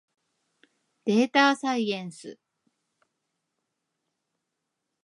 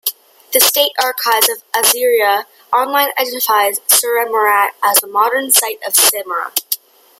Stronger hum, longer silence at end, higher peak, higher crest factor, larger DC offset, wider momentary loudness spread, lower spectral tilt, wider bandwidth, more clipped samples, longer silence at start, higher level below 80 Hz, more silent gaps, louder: neither; first, 2.7 s vs 0.45 s; second, -8 dBFS vs 0 dBFS; first, 22 dB vs 14 dB; neither; first, 22 LU vs 8 LU; first, -4.5 dB/octave vs 2 dB/octave; second, 11.5 kHz vs over 20 kHz; neither; first, 1.05 s vs 0.05 s; second, -86 dBFS vs -70 dBFS; neither; second, -24 LUFS vs -13 LUFS